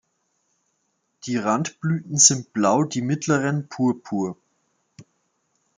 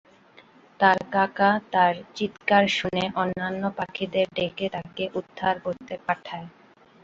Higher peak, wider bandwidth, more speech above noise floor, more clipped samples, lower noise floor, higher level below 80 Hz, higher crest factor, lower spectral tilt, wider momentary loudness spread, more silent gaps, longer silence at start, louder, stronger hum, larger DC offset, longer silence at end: first, 0 dBFS vs -4 dBFS; first, 10.5 kHz vs 7.8 kHz; first, 51 dB vs 29 dB; neither; first, -72 dBFS vs -54 dBFS; second, -68 dBFS vs -62 dBFS; about the same, 24 dB vs 22 dB; second, -3.5 dB/octave vs -5.5 dB/octave; first, 13 LU vs 10 LU; neither; first, 1.25 s vs 0.8 s; first, -21 LUFS vs -25 LUFS; neither; neither; first, 0.75 s vs 0.55 s